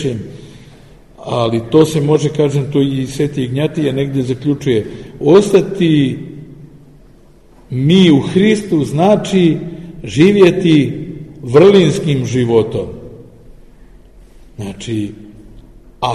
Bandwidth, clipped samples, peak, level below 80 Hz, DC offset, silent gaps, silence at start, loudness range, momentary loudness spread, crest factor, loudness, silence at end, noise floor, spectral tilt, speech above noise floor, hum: 12.5 kHz; under 0.1%; 0 dBFS; -42 dBFS; 0.3%; none; 0 s; 7 LU; 19 LU; 14 dB; -13 LUFS; 0 s; -44 dBFS; -7 dB/octave; 32 dB; none